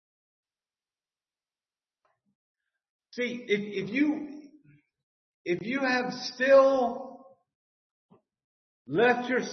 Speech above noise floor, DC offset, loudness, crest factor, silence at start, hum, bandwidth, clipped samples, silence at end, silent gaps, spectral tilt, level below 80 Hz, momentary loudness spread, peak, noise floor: over 64 dB; under 0.1%; -26 LUFS; 22 dB; 3.15 s; none; 6.4 kHz; under 0.1%; 0 s; 5.03-5.45 s, 7.55-8.09 s, 8.44-8.85 s; -5 dB/octave; -76 dBFS; 21 LU; -10 dBFS; under -90 dBFS